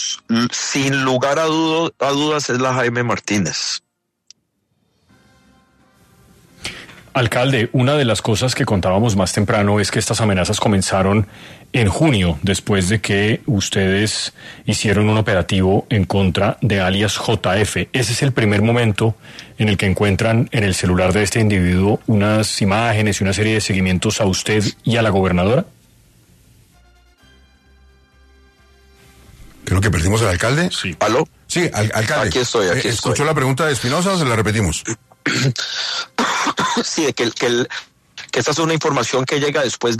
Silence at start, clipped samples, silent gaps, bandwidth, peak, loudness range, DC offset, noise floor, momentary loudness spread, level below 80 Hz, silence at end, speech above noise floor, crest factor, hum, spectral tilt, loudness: 0 s; under 0.1%; none; 13.5 kHz; -2 dBFS; 5 LU; under 0.1%; -67 dBFS; 5 LU; -42 dBFS; 0 s; 50 dB; 16 dB; none; -4.5 dB/octave; -17 LUFS